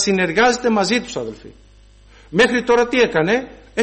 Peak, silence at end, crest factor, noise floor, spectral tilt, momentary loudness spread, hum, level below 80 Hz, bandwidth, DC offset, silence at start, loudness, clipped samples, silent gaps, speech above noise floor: -4 dBFS; 0 s; 14 dB; -47 dBFS; -4 dB/octave; 13 LU; 50 Hz at -45 dBFS; -46 dBFS; 8.8 kHz; under 0.1%; 0 s; -17 LUFS; under 0.1%; none; 30 dB